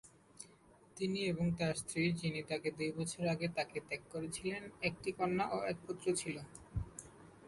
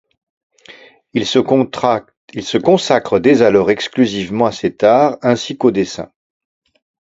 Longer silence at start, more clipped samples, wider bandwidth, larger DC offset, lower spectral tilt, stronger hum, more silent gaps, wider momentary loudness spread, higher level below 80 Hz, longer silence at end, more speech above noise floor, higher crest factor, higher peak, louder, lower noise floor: second, 0.05 s vs 0.7 s; neither; first, 11.5 kHz vs 8 kHz; neither; about the same, -5 dB/octave vs -5.5 dB/octave; neither; second, none vs 2.17-2.28 s; first, 14 LU vs 11 LU; second, -60 dBFS vs -52 dBFS; second, 0 s vs 1 s; about the same, 26 dB vs 28 dB; about the same, 16 dB vs 16 dB; second, -22 dBFS vs 0 dBFS; second, -39 LUFS vs -14 LUFS; first, -64 dBFS vs -42 dBFS